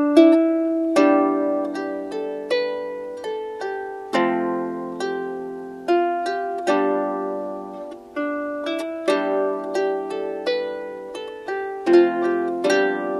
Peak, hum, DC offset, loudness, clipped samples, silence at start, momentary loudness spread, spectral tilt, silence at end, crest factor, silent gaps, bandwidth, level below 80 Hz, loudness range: -2 dBFS; none; under 0.1%; -22 LUFS; under 0.1%; 0 s; 14 LU; -5 dB/octave; 0 s; 20 dB; none; 11.5 kHz; -68 dBFS; 4 LU